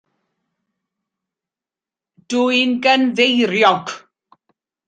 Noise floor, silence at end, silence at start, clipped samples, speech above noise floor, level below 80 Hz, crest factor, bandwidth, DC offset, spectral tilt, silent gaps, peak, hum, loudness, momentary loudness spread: -89 dBFS; 0.9 s; 2.3 s; under 0.1%; 74 dB; -70 dBFS; 18 dB; 9.2 kHz; under 0.1%; -3.5 dB/octave; none; -2 dBFS; none; -15 LUFS; 10 LU